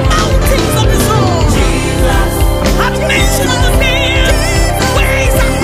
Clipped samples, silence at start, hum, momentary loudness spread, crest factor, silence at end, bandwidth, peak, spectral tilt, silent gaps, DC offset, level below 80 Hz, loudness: under 0.1%; 0 s; none; 2 LU; 10 dB; 0 s; 16 kHz; 0 dBFS; -4.5 dB/octave; none; under 0.1%; -14 dBFS; -11 LUFS